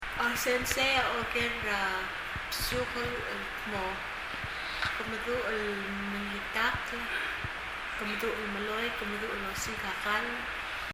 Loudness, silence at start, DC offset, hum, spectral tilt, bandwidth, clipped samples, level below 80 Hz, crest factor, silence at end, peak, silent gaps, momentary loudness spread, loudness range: -32 LUFS; 0 s; under 0.1%; none; -3 dB/octave; 16 kHz; under 0.1%; -50 dBFS; 20 dB; 0 s; -12 dBFS; none; 7 LU; 4 LU